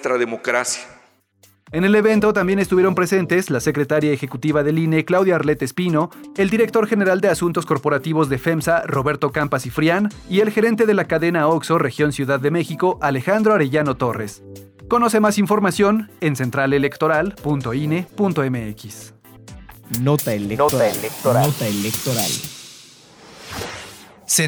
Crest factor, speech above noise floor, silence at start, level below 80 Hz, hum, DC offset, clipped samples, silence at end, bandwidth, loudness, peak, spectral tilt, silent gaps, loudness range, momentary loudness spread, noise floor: 14 dB; 38 dB; 0 s; -50 dBFS; none; under 0.1%; under 0.1%; 0 s; over 20 kHz; -19 LUFS; -4 dBFS; -5.5 dB/octave; none; 4 LU; 10 LU; -56 dBFS